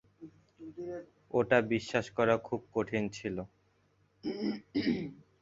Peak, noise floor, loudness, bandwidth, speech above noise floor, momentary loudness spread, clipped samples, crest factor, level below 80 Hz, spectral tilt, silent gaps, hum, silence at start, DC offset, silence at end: -12 dBFS; -71 dBFS; -33 LUFS; 8 kHz; 38 dB; 17 LU; under 0.1%; 22 dB; -64 dBFS; -6 dB/octave; none; none; 0.2 s; under 0.1%; 0.2 s